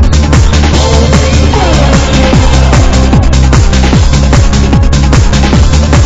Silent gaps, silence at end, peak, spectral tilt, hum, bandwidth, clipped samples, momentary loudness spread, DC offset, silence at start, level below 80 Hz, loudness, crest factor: none; 0 s; 0 dBFS; -5.5 dB/octave; none; 8.2 kHz; 5%; 1 LU; under 0.1%; 0 s; -8 dBFS; -7 LUFS; 4 dB